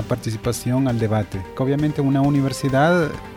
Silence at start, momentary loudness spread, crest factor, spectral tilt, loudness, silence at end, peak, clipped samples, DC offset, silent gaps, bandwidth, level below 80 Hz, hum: 0 s; 7 LU; 14 dB; -6.5 dB/octave; -20 LUFS; 0 s; -6 dBFS; under 0.1%; under 0.1%; none; 16 kHz; -44 dBFS; none